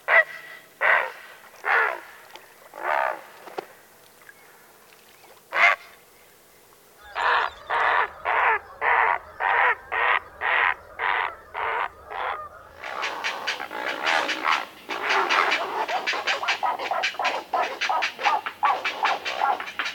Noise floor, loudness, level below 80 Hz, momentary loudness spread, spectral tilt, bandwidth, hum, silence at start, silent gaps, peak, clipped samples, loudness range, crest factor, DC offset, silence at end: -54 dBFS; -24 LUFS; -64 dBFS; 15 LU; -1 dB/octave; 19 kHz; none; 0.1 s; none; -4 dBFS; under 0.1%; 6 LU; 22 dB; under 0.1%; 0 s